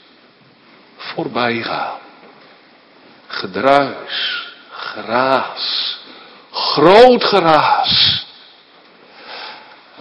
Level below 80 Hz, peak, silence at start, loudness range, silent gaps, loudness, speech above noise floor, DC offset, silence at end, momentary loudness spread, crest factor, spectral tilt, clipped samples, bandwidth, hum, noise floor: -52 dBFS; 0 dBFS; 1 s; 10 LU; none; -14 LUFS; 35 dB; under 0.1%; 0 s; 21 LU; 16 dB; -5.5 dB/octave; 0.2%; 11 kHz; none; -48 dBFS